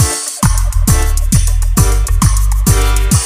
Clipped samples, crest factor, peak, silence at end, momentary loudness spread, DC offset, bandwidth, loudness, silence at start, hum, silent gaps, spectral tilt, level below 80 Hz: under 0.1%; 10 dB; 0 dBFS; 0 s; 2 LU; under 0.1%; 16 kHz; -13 LUFS; 0 s; none; none; -4 dB/octave; -12 dBFS